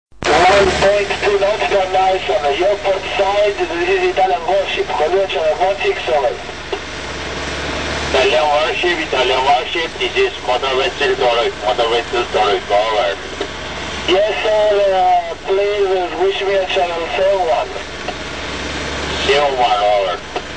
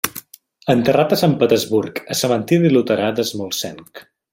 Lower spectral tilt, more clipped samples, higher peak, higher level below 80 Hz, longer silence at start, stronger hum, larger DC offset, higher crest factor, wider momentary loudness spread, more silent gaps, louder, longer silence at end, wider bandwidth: second, -3.5 dB/octave vs -5 dB/octave; neither; about the same, -2 dBFS vs 0 dBFS; first, -38 dBFS vs -56 dBFS; about the same, 0.05 s vs 0.05 s; neither; first, 1% vs under 0.1%; about the same, 14 dB vs 16 dB; about the same, 10 LU vs 11 LU; neither; about the same, -16 LUFS vs -17 LUFS; second, 0 s vs 0.3 s; second, 9.4 kHz vs 16.5 kHz